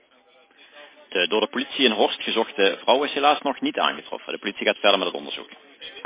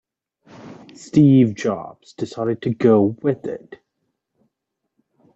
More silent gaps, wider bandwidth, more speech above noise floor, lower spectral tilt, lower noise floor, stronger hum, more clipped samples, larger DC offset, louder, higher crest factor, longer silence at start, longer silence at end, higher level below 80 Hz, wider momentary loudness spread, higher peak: neither; second, 4 kHz vs 8 kHz; second, 34 dB vs 60 dB; second, -7 dB/octave vs -8.5 dB/octave; second, -57 dBFS vs -78 dBFS; neither; neither; neither; second, -22 LUFS vs -18 LUFS; about the same, 20 dB vs 18 dB; first, 0.75 s vs 0.6 s; second, 0 s vs 1.6 s; second, -72 dBFS vs -60 dBFS; second, 14 LU vs 21 LU; about the same, -4 dBFS vs -4 dBFS